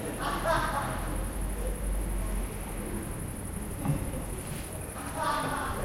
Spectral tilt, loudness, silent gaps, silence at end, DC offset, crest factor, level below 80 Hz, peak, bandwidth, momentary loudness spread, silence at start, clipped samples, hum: -4.5 dB/octave; -33 LUFS; none; 0 s; under 0.1%; 18 dB; -36 dBFS; -14 dBFS; 16 kHz; 9 LU; 0 s; under 0.1%; none